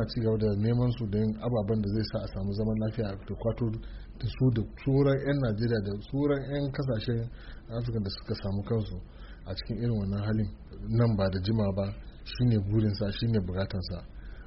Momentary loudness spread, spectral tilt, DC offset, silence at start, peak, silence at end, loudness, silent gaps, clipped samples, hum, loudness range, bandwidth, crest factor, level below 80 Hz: 12 LU; -7.5 dB/octave; under 0.1%; 0 s; -14 dBFS; 0 s; -30 LUFS; none; under 0.1%; none; 4 LU; 5.8 kHz; 16 dB; -44 dBFS